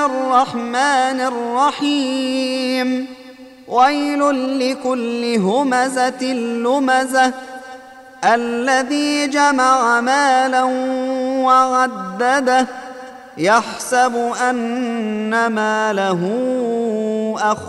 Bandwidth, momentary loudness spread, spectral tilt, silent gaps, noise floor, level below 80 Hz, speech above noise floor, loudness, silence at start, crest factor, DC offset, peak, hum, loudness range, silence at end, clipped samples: 12.5 kHz; 7 LU; -3.5 dB/octave; none; -38 dBFS; -64 dBFS; 22 dB; -17 LUFS; 0 s; 16 dB; under 0.1%; -2 dBFS; none; 3 LU; 0 s; under 0.1%